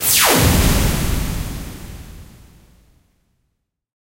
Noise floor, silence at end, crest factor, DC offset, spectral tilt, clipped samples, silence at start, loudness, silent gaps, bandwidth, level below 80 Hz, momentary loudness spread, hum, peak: -72 dBFS; 1.9 s; 20 dB; under 0.1%; -3.5 dB/octave; under 0.1%; 0 s; -16 LUFS; none; 16 kHz; -26 dBFS; 24 LU; none; 0 dBFS